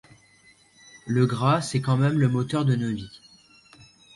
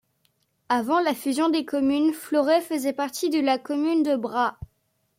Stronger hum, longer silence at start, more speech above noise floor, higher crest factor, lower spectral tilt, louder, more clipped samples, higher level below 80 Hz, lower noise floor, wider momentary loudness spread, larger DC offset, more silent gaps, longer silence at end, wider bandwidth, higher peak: neither; first, 0.95 s vs 0.7 s; second, 35 dB vs 48 dB; about the same, 18 dB vs 16 dB; first, -7 dB/octave vs -4 dB/octave; about the same, -24 LUFS vs -24 LUFS; neither; about the same, -58 dBFS vs -62 dBFS; second, -57 dBFS vs -71 dBFS; first, 12 LU vs 5 LU; neither; neither; first, 1 s vs 0.55 s; second, 11.5 kHz vs 16.5 kHz; about the same, -8 dBFS vs -8 dBFS